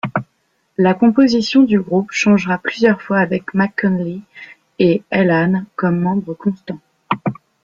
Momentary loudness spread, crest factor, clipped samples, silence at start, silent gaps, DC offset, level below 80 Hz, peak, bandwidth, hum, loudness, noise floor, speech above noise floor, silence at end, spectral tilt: 12 LU; 14 dB; under 0.1%; 0.05 s; none; under 0.1%; -56 dBFS; -2 dBFS; 7.4 kHz; none; -16 LUFS; -64 dBFS; 49 dB; 0.3 s; -6.5 dB/octave